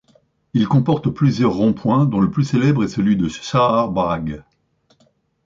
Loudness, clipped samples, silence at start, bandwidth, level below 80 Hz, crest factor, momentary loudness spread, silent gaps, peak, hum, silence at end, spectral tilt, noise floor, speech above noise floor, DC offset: -18 LUFS; under 0.1%; 0.55 s; 7.6 kHz; -46 dBFS; 14 dB; 5 LU; none; -4 dBFS; none; 1.05 s; -7.5 dB/octave; -61 dBFS; 44 dB; under 0.1%